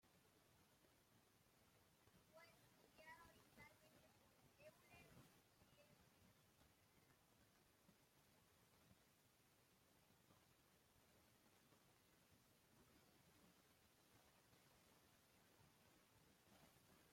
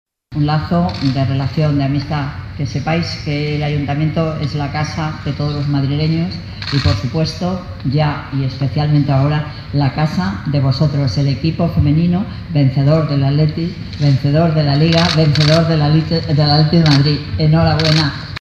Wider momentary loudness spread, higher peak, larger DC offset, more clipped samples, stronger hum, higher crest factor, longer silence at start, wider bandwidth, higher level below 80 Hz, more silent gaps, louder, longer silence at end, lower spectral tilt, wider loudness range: second, 4 LU vs 9 LU; second, -54 dBFS vs 0 dBFS; neither; neither; neither; first, 22 dB vs 14 dB; second, 0 s vs 0.3 s; first, 16.5 kHz vs 7.2 kHz; second, under -90 dBFS vs -34 dBFS; neither; second, -68 LUFS vs -15 LUFS; about the same, 0 s vs 0 s; second, -3.5 dB/octave vs -7 dB/octave; second, 1 LU vs 6 LU